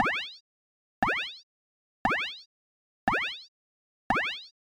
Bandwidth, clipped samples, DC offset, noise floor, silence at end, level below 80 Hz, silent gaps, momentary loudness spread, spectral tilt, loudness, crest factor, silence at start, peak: 18.5 kHz; under 0.1%; under 0.1%; under -90 dBFS; 0.15 s; -56 dBFS; 0.40-1.02 s, 1.43-2.05 s, 2.46-3.07 s, 3.48-4.10 s; 14 LU; -4 dB/octave; -30 LUFS; 22 dB; 0 s; -12 dBFS